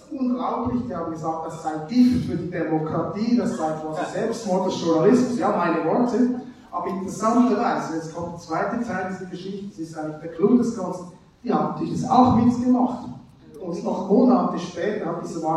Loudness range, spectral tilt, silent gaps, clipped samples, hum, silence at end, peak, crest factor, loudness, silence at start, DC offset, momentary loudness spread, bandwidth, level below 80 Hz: 5 LU; -7 dB/octave; none; under 0.1%; none; 0 s; -4 dBFS; 20 dB; -23 LUFS; 0.1 s; under 0.1%; 15 LU; 10.5 kHz; -56 dBFS